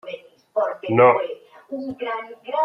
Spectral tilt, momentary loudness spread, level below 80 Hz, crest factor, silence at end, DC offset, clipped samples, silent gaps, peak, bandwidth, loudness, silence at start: -8.5 dB/octave; 21 LU; -70 dBFS; 20 dB; 0 s; under 0.1%; under 0.1%; none; -2 dBFS; 5.8 kHz; -21 LUFS; 0.05 s